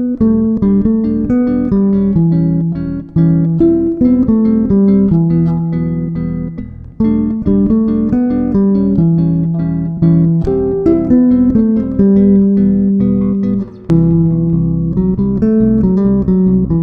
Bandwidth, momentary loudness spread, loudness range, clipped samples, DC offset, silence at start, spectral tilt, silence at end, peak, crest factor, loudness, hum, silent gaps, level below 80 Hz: 2.4 kHz; 7 LU; 3 LU; under 0.1%; under 0.1%; 0 s; -12.5 dB/octave; 0 s; 0 dBFS; 12 dB; -12 LUFS; none; none; -30 dBFS